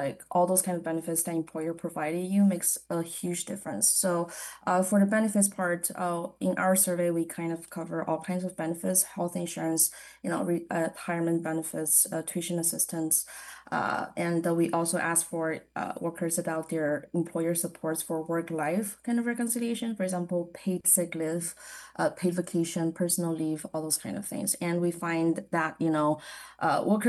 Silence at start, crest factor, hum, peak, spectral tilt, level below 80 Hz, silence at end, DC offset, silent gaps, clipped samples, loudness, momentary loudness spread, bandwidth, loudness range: 0 s; 20 dB; none; -8 dBFS; -4 dB/octave; -72 dBFS; 0 s; under 0.1%; none; under 0.1%; -28 LUFS; 10 LU; 13 kHz; 4 LU